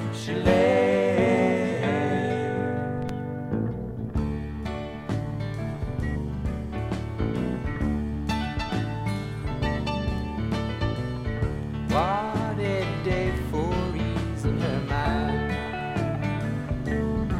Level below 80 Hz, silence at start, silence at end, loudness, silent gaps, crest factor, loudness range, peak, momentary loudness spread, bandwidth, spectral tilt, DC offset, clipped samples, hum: -36 dBFS; 0 s; 0 s; -27 LUFS; none; 20 dB; 6 LU; -6 dBFS; 9 LU; 13.5 kHz; -7.5 dB/octave; under 0.1%; under 0.1%; none